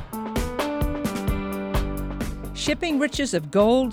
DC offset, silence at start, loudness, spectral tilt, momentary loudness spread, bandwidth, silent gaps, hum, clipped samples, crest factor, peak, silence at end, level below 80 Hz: under 0.1%; 0 s; -25 LUFS; -5 dB/octave; 10 LU; 18.5 kHz; none; none; under 0.1%; 18 dB; -6 dBFS; 0 s; -32 dBFS